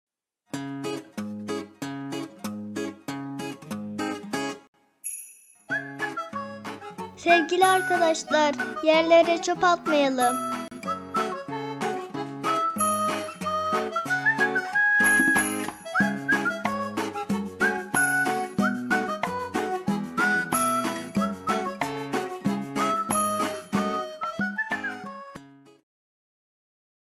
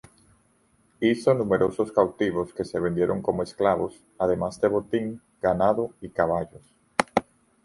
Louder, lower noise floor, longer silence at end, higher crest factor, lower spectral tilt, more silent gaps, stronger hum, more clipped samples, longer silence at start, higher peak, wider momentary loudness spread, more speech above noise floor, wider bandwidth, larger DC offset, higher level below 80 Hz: about the same, -25 LUFS vs -25 LUFS; second, -49 dBFS vs -64 dBFS; first, 1.55 s vs 0.45 s; about the same, 22 dB vs 24 dB; second, -3.5 dB/octave vs -6.5 dB/octave; first, 4.68-4.73 s vs none; neither; neither; second, 0.55 s vs 1 s; second, -6 dBFS vs -2 dBFS; first, 14 LU vs 7 LU; second, 27 dB vs 40 dB; first, 16 kHz vs 11.5 kHz; neither; second, -68 dBFS vs -54 dBFS